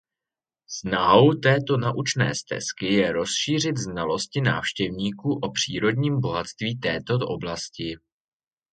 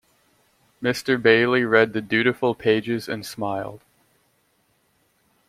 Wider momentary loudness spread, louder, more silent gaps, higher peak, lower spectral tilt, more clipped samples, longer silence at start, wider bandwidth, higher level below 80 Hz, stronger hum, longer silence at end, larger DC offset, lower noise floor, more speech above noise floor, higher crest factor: about the same, 12 LU vs 11 LU; second, -24 LUFS vs -21 LUFS; neither; about the same, -2 dBFS vs -2 dBFS; about the same, -4.5 dB/octave vs -5.5 dB/octave; neither; about the same, 0.7 s vs 0.8 s; second, 9.4 kHz vs 15.5 kHz; first, -54 dBFS vs -64 dBFS; neither; second, 0.75 s vs 1.7 s; neither; first, under -90 dBFS vs -66 dBFS; first, over 66 dB vs 45 dB; about the same, 22 dB vs 20 dB